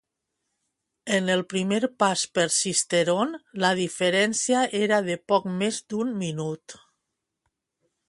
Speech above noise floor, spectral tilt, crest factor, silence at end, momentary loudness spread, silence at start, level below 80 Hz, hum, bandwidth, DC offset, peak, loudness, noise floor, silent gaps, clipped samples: 57 dB; -3.5 dB/octave; 20 dB; 1.35 s; 7 LU; 1.05 s; -70 dBFS; none; 11.5 kHz; under 0.1%; -6 dBFS; -24 LUFS; -82 dBFS; none; under 0.1%